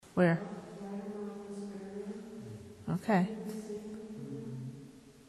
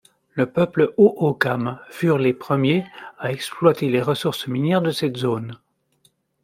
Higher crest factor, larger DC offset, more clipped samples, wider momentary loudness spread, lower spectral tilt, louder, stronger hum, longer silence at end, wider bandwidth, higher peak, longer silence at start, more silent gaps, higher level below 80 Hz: about the same, 22 dB vs 18 dB; neither; neither; first, 17 LU vs 12 LU; about the same, -7.5 dB/octave vs -6.5 dB/octave; second, -37 LUFS vs -21 LUFS; neither; second, 0 s vs 0.9 s; second, 12.5 kHz vs 16 kHz; second, -16 dBFS vs -2 dBFS; second, 0.05 s vs 0.35 s; neither; second, -70 dBFS vs -62 dBFS